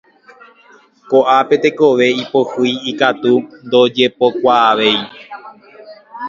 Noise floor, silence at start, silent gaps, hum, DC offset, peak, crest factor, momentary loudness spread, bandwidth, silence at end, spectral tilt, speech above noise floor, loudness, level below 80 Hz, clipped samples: -47 dBFS; 1.1 s; none; none; under 0.1%; 0 dBFS; 14 dB; 7 LU; 7.4 kHz; 0 s; -5 dB/octave; 34 dB; -13 LUFS; -62 dBFS; under 0.1%